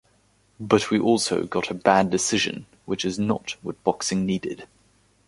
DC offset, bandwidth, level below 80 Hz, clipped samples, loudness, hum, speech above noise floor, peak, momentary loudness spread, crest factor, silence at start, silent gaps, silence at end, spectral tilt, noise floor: under 0.1%; 11.5 kHz; -58 dBFS; under 0.1%; -23 LUFS; none; 39 dB; -2 dBFS; 13 LU; 22 dB; 0.6 s; none; 0.65 s; -4 dB/octave; -62 dBFS